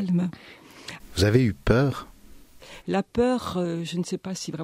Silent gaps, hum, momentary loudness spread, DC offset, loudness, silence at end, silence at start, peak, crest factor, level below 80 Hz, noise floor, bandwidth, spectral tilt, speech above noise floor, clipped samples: none; none; 19 LU; under 0.1%; -25 LUFS; 0 s; 0 s; -4 dBFS; 22 dB; -44 dBFS; -48 dBFS; 15.5 kHz; -6.5 dB/octave; 23 dB; under 0.1%